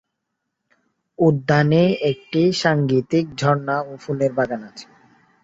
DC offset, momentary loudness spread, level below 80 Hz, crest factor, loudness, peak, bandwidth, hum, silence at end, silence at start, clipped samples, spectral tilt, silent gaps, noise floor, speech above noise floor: under 0.1%; 9 LU; -58 dBFS; 18 dB; -19 LUFS; -2 dBFS; 7.8 kHz; none; 0.6 s; 1.2 s; under 0.1%; -6.5 dB/octave; none; -78 dBFS; 59 dB